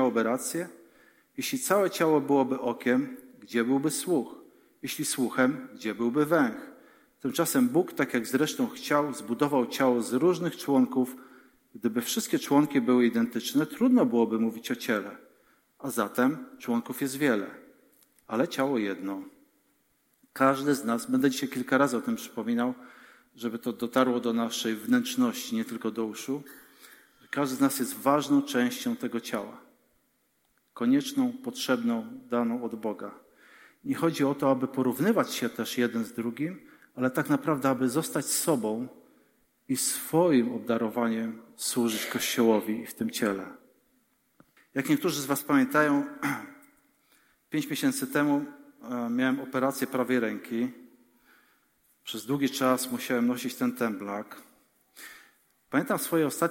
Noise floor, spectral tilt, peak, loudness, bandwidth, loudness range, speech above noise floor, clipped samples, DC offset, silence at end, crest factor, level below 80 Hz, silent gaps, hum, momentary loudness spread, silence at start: -72 dBFS; -4.5 dB/octave; -8 dBFS; -28 LUFS; 17 kHz; 4 LU; 44 dB; under 0.1%; under 0.1%; 0 s; 20 dB; -76 dBFS; none; none; 12 LU; 0 s